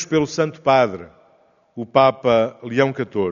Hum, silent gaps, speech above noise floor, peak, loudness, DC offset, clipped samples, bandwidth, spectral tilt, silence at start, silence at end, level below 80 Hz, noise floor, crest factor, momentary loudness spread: none; none; 39 dB; 0 dBFS; -19 LUFS; under 0.1%; under 0.1%; 7.4 kHz; -4.5 dB/octave; 0 s; 0 s; -58 dBFS; -57 dBFS; 18 dB; 13 LU